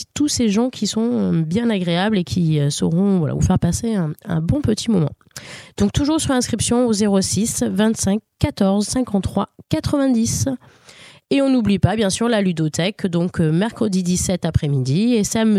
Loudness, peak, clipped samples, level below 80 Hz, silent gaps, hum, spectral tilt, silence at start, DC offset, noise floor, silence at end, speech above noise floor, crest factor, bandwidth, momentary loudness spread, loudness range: -19 LUFS; 0 dBFS; under 0.1%; -38 dBFS; none; none; -5.5 dB/octave; 0 s; under 0.1%; -45 dBFS; 0 s; 27 dB; 18 dB; 15 kHz; 5 LU; 2 LU